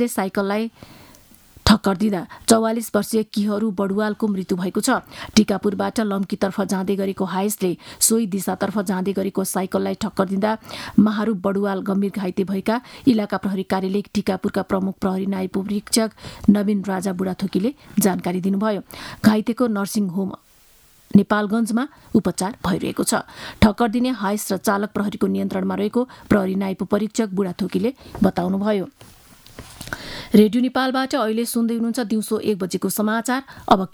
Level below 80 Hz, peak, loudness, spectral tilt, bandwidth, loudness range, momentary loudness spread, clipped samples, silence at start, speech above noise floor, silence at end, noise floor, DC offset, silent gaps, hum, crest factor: -46 dBFS; 0 dBFS; -21 LUFS; -5 dB/octave; 18.5 kHz; 2 LU; 7 LU; under 0.1%; 0 s; 32 dB; 0.05 s; -53 dBFS; under 0.1%; none; none; 20 dB